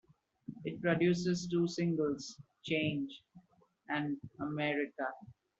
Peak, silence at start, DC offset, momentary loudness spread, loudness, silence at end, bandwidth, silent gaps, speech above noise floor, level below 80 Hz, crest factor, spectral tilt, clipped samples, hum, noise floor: -18 dBFS; 0.5 s; under 0.1%; 17 LU; -36 LUFS; 0.3 s; 8 kHz; none; 29 dB; -72 dBFS; 18 dB; -6 dB/octave; under 0.1%; none; -64 dBFS